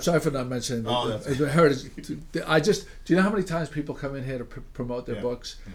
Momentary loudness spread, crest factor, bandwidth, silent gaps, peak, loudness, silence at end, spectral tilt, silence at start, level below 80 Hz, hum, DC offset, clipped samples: 13 LU; 18 dB; 16.5 kHz; none; -8 dBFS; -26 LUFS; 0 s; -5.5 dB/octave; 0 s; -44 dBFS; none; under 0.1%; under 0.1%